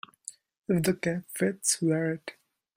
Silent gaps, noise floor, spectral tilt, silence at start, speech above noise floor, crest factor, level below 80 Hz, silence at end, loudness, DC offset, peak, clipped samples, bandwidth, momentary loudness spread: none; -49 dBFS; -4.5 dB/octave; 0.7 s; 21 dB; 22 dB; -66 dBFS; 0.45 s; -28 LUFS; under 0.1%; -8 dBFS; under 0.1%; 16 kHz; 18 LU